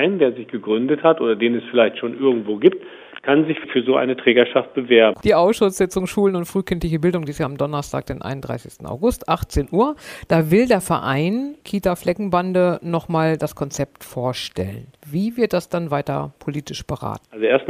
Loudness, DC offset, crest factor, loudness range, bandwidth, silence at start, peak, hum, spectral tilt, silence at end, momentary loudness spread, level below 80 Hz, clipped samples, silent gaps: -20 LUFS; under 0.1%; 20 dB; 6 LU; 15.5 kHz; 0 s; 0 dBFS; none; -6 dB/octave; 0 s; 13 LU; -42 dBFS; under 0.1%; none